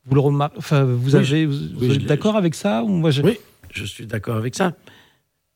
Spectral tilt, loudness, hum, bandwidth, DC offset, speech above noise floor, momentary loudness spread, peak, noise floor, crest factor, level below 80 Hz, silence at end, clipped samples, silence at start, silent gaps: -7 dB/octave; -20 LUFS; none; 16 kHz; under 0.1%; 43 dB; 12 LU; -2 dBFS; -62 dBFS; 18 dB; -54 dBFS; 0.8 s; under 0.1%; 0.05 s; none